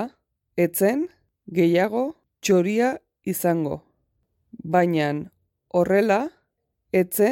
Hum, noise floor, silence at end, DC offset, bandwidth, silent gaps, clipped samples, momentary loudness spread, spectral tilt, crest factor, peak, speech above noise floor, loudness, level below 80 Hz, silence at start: none; -75 dBFS; 0 s; under 0.1%; 17.5 kHz; none; under 0.1%; 13 LU; -6 dB/octave; 16 dB; -8 dBFS; 54 dB; -23 LUFS; -62 dBFS; 0 s